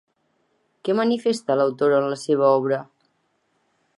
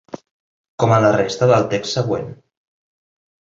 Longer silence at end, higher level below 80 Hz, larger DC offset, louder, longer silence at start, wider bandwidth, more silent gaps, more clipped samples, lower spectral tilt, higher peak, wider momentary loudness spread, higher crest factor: about the same, 1.15 s vs 1.1 s; second, -78 dBFS vs -52 dBFS; neither; second, -21 LUFS vs -17 LUFS; first, 0.85 s vs 0.15 s; first, 11.5 kHz vs 7.8 kHz; second, none vs 0.31-0.78 s; neither; about the same, -6 dB/octave vs -6 dB/octave; about the same, -4 dBFS vs -2 dBFS; second, 7 LU vs 20 LU; about the same, 18 dB vs 18 dB